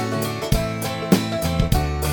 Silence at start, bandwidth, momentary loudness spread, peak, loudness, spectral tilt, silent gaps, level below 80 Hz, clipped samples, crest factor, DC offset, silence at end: 0 s; 19.5 kHz; 5 LU; -2 dBFS; -22 LUFS; -5.5 dB/octave; none; -28 dBFS; under 0.1%; 18 dB; under 0.1%; 0 s